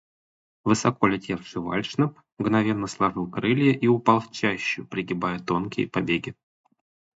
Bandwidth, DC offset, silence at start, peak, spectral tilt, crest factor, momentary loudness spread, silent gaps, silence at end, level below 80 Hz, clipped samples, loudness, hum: 8 kHz; under 0.1%; 0.65 s; -4 dBFS; -6 dB/octave; 22 dB; 9 LU; 2.32-2.37 s; 0.9 s; -58 dBFS; under 0.1%; -25 LUFS; none